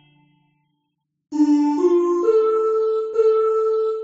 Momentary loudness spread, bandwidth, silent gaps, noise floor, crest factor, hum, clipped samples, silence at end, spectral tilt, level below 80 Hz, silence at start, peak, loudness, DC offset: 4 LU; 7.8 kHz; none; -75 dBFS; 12 dB; none; under 0.1%; 0 s; -5 dB/octave; -72 dBFS; 1.3 s; -6 dBFS; -19 LUFS; under 0.1%